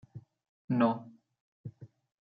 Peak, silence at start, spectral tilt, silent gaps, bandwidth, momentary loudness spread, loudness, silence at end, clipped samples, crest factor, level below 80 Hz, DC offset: -14 dBFS; 0.15 s; -7 dB/octave; 0.49-0.68 s, 1.40-1.64 s; 4.9 kHz; 24 LU; -31 LUFS; 0.35 s; under 0.1%; 22 dB; -78 dBFS; under 0.1%